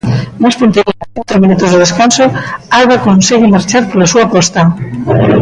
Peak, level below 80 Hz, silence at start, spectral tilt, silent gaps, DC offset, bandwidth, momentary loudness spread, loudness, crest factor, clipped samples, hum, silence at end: 0 dBFS; -38 dBFS; 0.05 s; -5 dB/octave; none; under 0.1%; 10.5 kHz; 7 LU; -9 LUFS; 8 dB; under 0.1%; none; 0 s